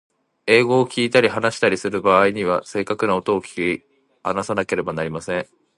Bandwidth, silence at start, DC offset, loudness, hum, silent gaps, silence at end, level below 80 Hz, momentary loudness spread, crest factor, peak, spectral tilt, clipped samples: 11.5 kHz; 0.45 s; under 0.1%; -20 LUFS; none; none; 0.35 s; -56 dBFS; 10 LU; 20 dB; 0 dBFS; -5 dB/octave; under 0.1%